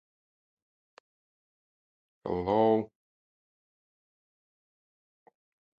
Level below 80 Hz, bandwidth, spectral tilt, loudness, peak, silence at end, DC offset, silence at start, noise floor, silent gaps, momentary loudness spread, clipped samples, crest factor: -64 dBFS; 5.4 kHz; -9 dB/octave; -28 LUFS; -14 dBFS; 2.95 s; under 0.1%; 2.25 s; under -90 dBFS; none; 18 LU; under 0.1%; 22 dB